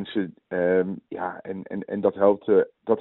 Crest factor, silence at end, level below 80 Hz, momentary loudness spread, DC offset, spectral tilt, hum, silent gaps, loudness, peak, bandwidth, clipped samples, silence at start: 18 dB; 0 s; -68 dBFS; 12 LU; under 0.1%; -6 dB/octave; none; none; -25 LUFS; -6 dBFS; 4.1 kHz; under 0.1%; 0 s